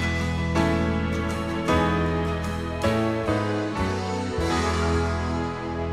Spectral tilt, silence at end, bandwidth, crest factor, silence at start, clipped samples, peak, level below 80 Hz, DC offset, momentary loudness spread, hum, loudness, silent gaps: -6 dB/octave; 0 s; 13 kHz; 16 dB; 0 s; under 0.1%; -8 dBFS; -36 dBFS; 0.2%; 5 LU; none; -25 LUFS; none